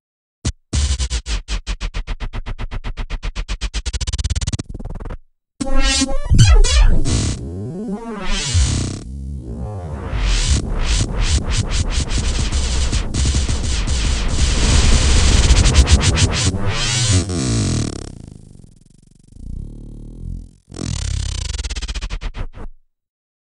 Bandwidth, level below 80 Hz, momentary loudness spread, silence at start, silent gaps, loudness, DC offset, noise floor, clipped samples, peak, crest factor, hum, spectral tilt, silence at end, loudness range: 11 kHz; -20 dBFS; 19 LU; 0.45 s; none; -19 LUFS; under 0.1%; -48 dBFS; under 0.1%; 0 dBFS; 18 dB; none; -4 dB/octave; 0.85 s; 12 LU